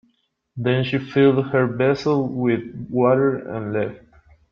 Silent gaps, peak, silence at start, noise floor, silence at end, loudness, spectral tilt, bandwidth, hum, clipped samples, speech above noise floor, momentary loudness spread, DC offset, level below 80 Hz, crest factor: none; -4 dBFS; 0.55 s; -68 dBFS; 0.55 s; -20 LUFS; -8.5 dB/octave; 7 kHz; none; under 0.1%; 48 dB; 10 LU; under 0.1%; -56 dBFS; 16 dB